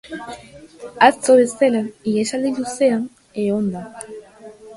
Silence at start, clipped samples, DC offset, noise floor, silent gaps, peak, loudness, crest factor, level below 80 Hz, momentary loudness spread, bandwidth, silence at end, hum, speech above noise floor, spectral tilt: 0.05 s; under 0.1%; under 0.1%; -41 dBFS; none; 0 dBFS; -18 LUFS; 20 dB; -60 dBFS; 21 LU; 11.5 kHz; 0 s; none; 23 dB; -4.5 dB/octave